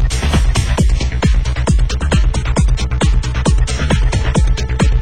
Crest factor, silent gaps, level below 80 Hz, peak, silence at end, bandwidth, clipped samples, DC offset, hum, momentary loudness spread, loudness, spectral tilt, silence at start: 12 dB; none; -14 dBFS; 0 dBFS; 0 s; 11.5 kHz; under 0.1%; 3%; none; 1 LU; -16 LUFS; -5.5 dB/octave; 0 s